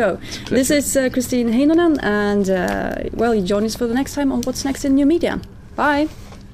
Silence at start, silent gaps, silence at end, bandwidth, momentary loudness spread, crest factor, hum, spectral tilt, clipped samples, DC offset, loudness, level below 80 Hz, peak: 0 s; none; 0 s; 16 kHz; 8 LU; 14 dB; none; -4.5 dB/octave; under 0.1%; under 0.1%; -18 LUFS; -38 dBFS; -4 dBFS